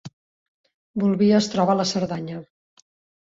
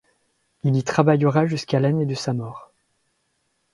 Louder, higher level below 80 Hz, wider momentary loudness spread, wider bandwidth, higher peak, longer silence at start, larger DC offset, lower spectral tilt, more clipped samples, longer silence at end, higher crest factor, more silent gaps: about the same, -21 LUFS vs -21 LUFS; about the same, -62 dBFS vs -62 dBFS; first, 15 LU vs 11 LU; second, 7.8 kHz vs 11.5 kHz; second, -6 dBFS vs 0 dBFS; second, 0.05 s vs 0.65 s; neither; about the same, -6 dB/octave vs -7 dB/octave; neither; second, 0.8 s vs 1.1 s; about the same, 18 dB vs 22 dB; first, 0.13-0.64 s, 0.74-0.94 s vs none